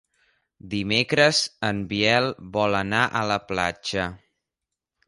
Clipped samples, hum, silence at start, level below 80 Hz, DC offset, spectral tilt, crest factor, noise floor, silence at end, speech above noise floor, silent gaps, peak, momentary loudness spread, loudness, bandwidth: under 0.1%; none; 0.65 s; -52 dBFS; under 0.1%; -4 dB/octave; 20 dB; -86 dBFS; 0.9 s; 62 dB; none; -4 dBFS; 10 LU; -23 LUFS; 11.5 kHz